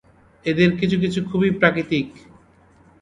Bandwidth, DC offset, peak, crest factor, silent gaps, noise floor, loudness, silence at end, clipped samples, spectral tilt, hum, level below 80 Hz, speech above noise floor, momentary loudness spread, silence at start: 9.8 kHz; under 0.1%; 0 dBFS; 20 dB; none; -53 dBFS; -20 LUFS; 0.9 s; under 0.1%; -7 dB/octave; none; -50 dBFS; 34 dB; 8 LU; 0.45 s